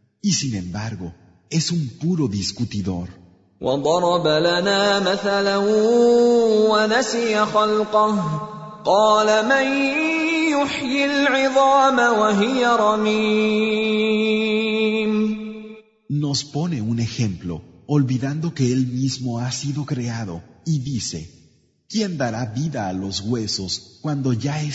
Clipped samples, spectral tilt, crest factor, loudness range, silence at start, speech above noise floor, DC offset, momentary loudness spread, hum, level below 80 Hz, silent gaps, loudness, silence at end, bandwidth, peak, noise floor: under 0.1%; -5 dB/octave; 16 dB; 8 LU; 0.25 s; 37 dB; under 0.1%; 12 LU; none; -54 dBFS; none; -20 LUFS; 0 s; 8 kHz; -4 dBFS; -56 dBFS